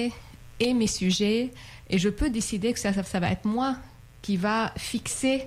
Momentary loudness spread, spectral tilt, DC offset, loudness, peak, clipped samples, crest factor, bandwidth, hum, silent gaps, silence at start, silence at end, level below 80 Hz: 9 LU; -4.5 dB/octave; under 0.1%; -27 LUFS; -14 dBFS; under 0.1%; 12 dB; 15.5 kHz; none; none; 0 s; 0 s; -44 dBFS